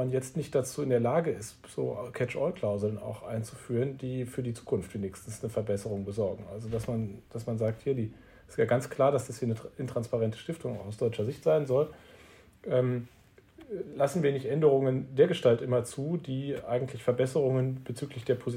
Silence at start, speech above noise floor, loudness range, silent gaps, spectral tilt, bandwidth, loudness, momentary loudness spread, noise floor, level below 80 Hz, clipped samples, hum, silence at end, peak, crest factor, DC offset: 0 s; 26 dB; 6 LU; none; -7 dB/octave; 16 kHz; -31 LUFS; 11 LU; -56 dBFS; -62 dBFS; under 0.1%; none; 0 s; -10 dBFS; 20 dB; under 0.1%